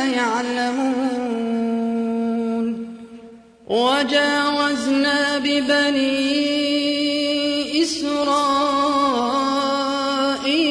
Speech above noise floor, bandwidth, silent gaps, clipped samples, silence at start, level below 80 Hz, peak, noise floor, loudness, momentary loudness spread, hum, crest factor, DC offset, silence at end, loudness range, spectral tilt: 25 dB; 11 kHz; none; under 0.1%; 0 s; -58 dBFS; -6 dBFS; -43 dBFS; -19 LUFS; 5 LU; none; 14 dB; under 0.1%; 0 s; 4 LU; -3 dB/octave